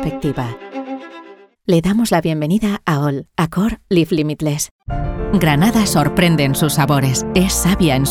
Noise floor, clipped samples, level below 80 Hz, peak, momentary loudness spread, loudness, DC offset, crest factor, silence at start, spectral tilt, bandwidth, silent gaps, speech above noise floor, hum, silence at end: -40 dBFS; under 0.1%; -32 dBFS; 0 dBFS; 12 LU; -16 LUFS; under 0.1%; 16 dB; 0 s; -5.5 dB/octave; 17 kHz; 4.71-4.79 s; 24 dB; none; 0 s